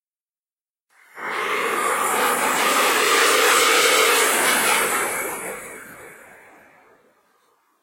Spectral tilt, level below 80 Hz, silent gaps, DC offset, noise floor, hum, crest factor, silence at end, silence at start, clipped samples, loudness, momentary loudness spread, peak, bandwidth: 0.5 dB/octave; -68 dBFS; none; under 0.1%; under -90 dBFS; none; 18 dB; 1.7 s; 1.15 s; under 0.1%; -17 LUFS; 16 LU; -4 dBFS; 16.5 kHz